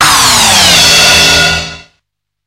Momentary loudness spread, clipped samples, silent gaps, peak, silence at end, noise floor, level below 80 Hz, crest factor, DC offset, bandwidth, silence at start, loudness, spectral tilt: 9 LU; 0.9%; none; 0 dBFS; 0.65 s; -68 dBFS; -30 dBFS; 8 dB; under 0.1%; over 20 kHz; 0 s; -4 LUFS; -0.5 dB/octave